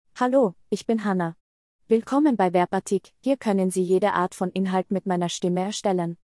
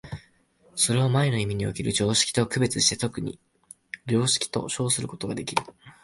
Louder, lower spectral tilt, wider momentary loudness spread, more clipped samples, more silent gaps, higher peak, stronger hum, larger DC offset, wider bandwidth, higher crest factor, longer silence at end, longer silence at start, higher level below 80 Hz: about the same, -24 LUFS vs -24 LUFS; first, -6 dB/octave vs -3.5 dB/octave; second, 6 LU vs 14 LU; neither; first, 1.40-1.79 s vs none; about the same, -8 dBFS vs -6 dBFS; neither; neither; about the same, 12 kHz vs 11.5 kHz; second, 16 dB vs 22 dB; about the same, 0.1 s vs 0.15 s; about the same, 0.15 s vs 0.05 s; second, -68 dBFS vs -54 dBFS